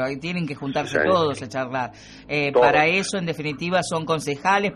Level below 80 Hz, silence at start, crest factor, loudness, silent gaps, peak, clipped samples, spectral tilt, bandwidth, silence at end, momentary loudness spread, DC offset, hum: -54 dBFS; 0 s; 18 dB; -22 LUFS; none; -4 dBFS; under 0.1%; -4.5 dB/octave; 13 kHz; 0 s; 10 LU; under 0.1%; none